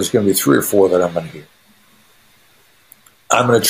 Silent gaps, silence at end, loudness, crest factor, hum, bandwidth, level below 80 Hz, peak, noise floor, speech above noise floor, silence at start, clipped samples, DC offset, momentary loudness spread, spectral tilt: none; 0 s; -15 LUFS; 18 dB; none; 15.5 kHz; -56 dBFS; 0 dBFS; -53 dBFS; 38 dB; 0 s; under 0.1%; 0.1%; 10 LU; -4 dB/octave